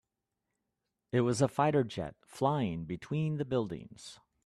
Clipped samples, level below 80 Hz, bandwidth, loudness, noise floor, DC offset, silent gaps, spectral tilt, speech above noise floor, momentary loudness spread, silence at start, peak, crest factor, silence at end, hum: under 0.1%; -64 dBFS; 12.5 kHz; -33 LUFS; -87 dBFS; under 0.1%; none; -6.5 dB/octave; 54 dB; 15 LU; 1.15 s; -14 dBFS; 20 dB; 0.3 s; none